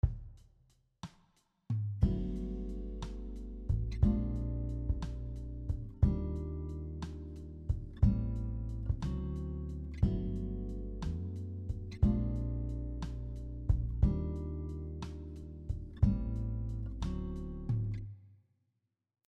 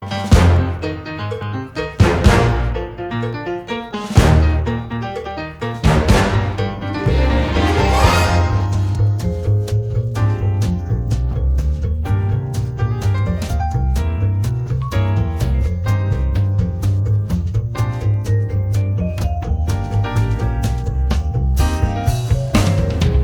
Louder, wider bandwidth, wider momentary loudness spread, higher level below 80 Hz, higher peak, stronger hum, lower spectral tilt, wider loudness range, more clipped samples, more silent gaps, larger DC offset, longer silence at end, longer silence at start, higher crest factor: second, -37 LUFS vs -18 LUFS; second, 7.6 kHz vs 15.5 kHz; first, 13 LU vs 10 LU; second, -38 dBFS vs -22 dBFS; second, -14 dBFS vs 0 dBFS; neither; first, -9.5 dB/octave vs -6.5 dB/octave; about the same, 3 LU vs 3 LU; neither; neither; neither; first, 0.95 s vs 0 s; about the same, 0.05 s vs 0 s; about the same, 20 dB vs 16 dB